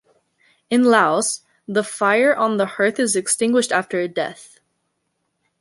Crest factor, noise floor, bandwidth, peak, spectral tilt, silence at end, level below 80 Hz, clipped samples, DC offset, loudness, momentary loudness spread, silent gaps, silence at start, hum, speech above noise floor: 18 dB; -73 dBFS; 11.5 kHz; -2 dBFS; -3 dB/octave; 1.15 s; -70 dBFS; under 0.1%; under 0.1%; -19 LUFS; 9 LU; none; 0.7 s; none; 54 dB